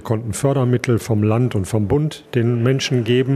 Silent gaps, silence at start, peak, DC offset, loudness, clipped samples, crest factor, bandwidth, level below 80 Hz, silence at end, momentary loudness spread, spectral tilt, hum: none; 0 s; -2 dBFS; under 0.1%; -19 LUFS; under 0.1%; 14 dB; 14 kHz; -46 dBFS; 0 s; 4 LU; -6.5 dB/octave; none